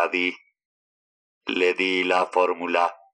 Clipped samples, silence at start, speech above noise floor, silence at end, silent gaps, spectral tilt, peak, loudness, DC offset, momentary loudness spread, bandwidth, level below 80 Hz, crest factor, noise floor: under 0.1%; 0 s; over 67 dB; 0.2 s; 0.65-1.41 s; -3.5 dB/octave; -6 dBFS; -23 LUFS; under 0.1%; 6 LU; 9.8 kHz; -76 dBFS; 18 dB; under -90 dBFS